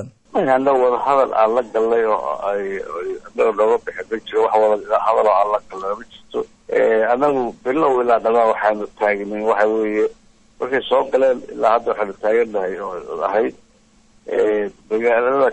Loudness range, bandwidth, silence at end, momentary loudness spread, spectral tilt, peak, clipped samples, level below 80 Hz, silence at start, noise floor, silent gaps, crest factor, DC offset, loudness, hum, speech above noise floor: 3 LU; 8.6 kHz; 0 s; 11 LU; -5.5 dB/octave; -4 dBFS; under 0.1%; -54 dBFS; 0 s; -53 dBFS; none; 16 dB; under 0.1%; -18 LUFS; none; 36 dB